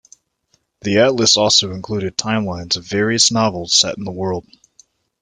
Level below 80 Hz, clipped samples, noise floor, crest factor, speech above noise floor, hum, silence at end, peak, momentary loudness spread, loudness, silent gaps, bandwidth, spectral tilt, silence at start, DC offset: -54 dBFS; under 0.1%; -64 dBFS; 18 dB; 47 dB; none; 0.8 s; 0 dBFS; 12 LU; -16 LUFS; none; 11 kHz; -3 dB/octave; 0.85 s; under 0.1%